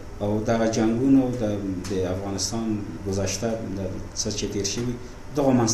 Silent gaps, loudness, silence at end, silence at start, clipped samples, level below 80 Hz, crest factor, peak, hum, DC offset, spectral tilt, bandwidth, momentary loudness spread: none; -25 LUFS; 0 s; 0 s; under 0.1%; -40 dBFS; 16 dB; -8 dBFS; none; under 0.1%; -5 dB/octave; 13.5 kHz; 10 LU